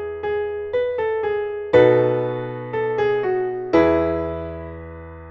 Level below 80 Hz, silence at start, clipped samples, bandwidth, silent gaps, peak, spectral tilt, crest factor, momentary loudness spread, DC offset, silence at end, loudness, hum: -44 dBFS; 0 s; under 0.1%; 6.6 kHz; none; -2 dBFS; -8.5 dB/octave; 18 dB; 16 LU; under 0.1%; 0 s; -20 LUFS; none